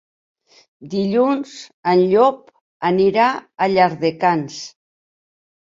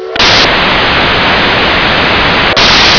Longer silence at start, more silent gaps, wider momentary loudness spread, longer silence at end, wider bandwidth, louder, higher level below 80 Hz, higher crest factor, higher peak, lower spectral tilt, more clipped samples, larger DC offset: first, 0.8 s vs 0 s; first, 1.74-1.83 s, 2.61-2.80 s vs none; first, 16 LU vs 3 LU; first, 0.95 s vs 0 s; first, 7.6 kHz vs 5.4 kHz; second, -17 LUFS vs -6 LUFS; second, -62 dBFS vs -24 dBFS; first, 18 dB vs 8 dB; about the same, -2 dBFS vs 0 dBFS; first, -6 dB/octave vs -3 dB/octave; neither; neither